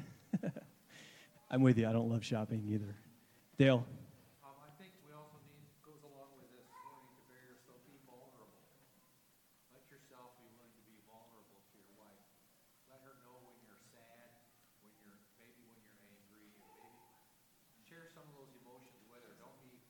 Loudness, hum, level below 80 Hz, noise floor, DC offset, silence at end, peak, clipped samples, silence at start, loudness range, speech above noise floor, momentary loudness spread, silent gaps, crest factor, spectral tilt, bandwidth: -35 LUFS; none; -80 dBFS; -72 dBFS; under 0.1%; 13 s; -16 dBFS; under 0.1%; 0 s; 28 LU; 38 dB; 31 LU; none; 26 dB; -7.5 dB/octave; 19 kHz